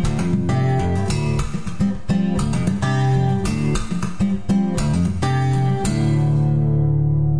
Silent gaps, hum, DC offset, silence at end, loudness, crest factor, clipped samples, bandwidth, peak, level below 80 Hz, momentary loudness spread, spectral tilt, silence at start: none; none; 2%; 0 s; -20 LUFS; 12 dB; under 0.1%; 11 kHz; -8 dBFS; -32 dBFS; 4 LU; -7 dB/octave; 0 s